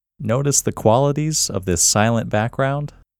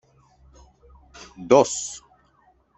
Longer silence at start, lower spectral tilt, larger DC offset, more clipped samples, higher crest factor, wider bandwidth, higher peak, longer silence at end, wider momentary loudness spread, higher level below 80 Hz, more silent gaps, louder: second, 0.2 s vs 1.4 s; about the same, -4 dB/octave vs -4 dB/octave; neither; neither; second, 18 dB vs 24 dB; first, 19.5 kHz vs 8.4 kHz; about the same, 0 dBFS vs -2 dBFS; second, 0.35 s vs 0.8 s; second, 7 LU vs 27 LU; first, -44 dBFS vs -56 dBFS; neither; about the same, -18 LUFS vs -20 LUFS